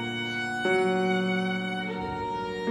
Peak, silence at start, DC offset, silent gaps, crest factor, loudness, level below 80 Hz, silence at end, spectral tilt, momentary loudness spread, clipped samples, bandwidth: -14 dBFS; 0 s; under 0.1%; none; 14 dB; -28 LUFS; -56 dBFS; 0 s; -5.5 dB/octave; 7 LU; under 0.1%; 12 kHz